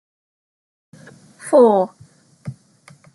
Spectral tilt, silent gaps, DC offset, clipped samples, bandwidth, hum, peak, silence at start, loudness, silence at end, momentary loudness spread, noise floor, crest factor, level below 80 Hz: -6.5 dB/octave; none; under 0.1%; under 0.1%; 12 kHz; none; -2 dBFS; 1.45 s; -15 LUFS; 0.65 s; 24 LU; -50 dBFS; 18 dB; -68 dBFS